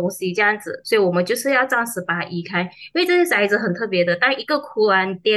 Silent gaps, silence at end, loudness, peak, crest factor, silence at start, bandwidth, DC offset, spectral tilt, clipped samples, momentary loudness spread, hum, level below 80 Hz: none; 0 s; -19 LUFS; -6 dBFS; 14 dB; 0 s; 13 kHz; under 0.1%; -4.5 dB/octave; under 0.1%; 7 LU; none; -70 dBFS